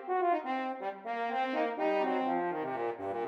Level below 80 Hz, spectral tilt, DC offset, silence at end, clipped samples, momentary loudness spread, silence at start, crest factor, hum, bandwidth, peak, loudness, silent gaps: -86 dBFS; -6.5 dB/octave; under 0.1%; 0 s; under 0.1%; 6 LU; 0 s; 14 dB; none; 7.6 kHz; -20 dBFS; -33 LUFS; none